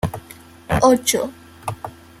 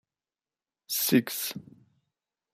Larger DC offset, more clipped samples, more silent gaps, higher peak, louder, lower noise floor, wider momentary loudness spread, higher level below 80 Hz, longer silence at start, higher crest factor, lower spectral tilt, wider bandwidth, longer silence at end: neither; neither; neither; first, -2 dBFS vs -10 dBFS; first, -19 LUFS vs -27 LUFS; second, -43 dBFS vs under -90 dBFS; first, 21 LU vs 12 LU; first, -42 dBFS vs -74 dBFS; second, 0.05 s vs 0.9 s; about the same, 20 dB vs 22 dB; about the same, -4 dB/octave vs -3.5 dB/octave; about the same, 16 kHz vs 15.5 kHz; second, 0.3 s vs 0.95 s